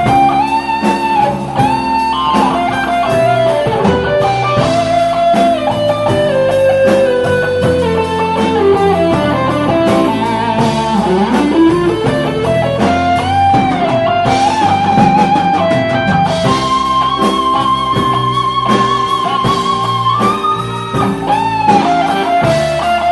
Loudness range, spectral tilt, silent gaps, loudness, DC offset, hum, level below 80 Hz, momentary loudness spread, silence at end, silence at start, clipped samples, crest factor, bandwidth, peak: 1 LU; -6 dB/octave; none; -12 LUFS; under 0.1%; none; -36 dBFS; 4 LU; 0 s; 0 s; under 0.1%; 12 dB; 12 kHz; 0 dBFS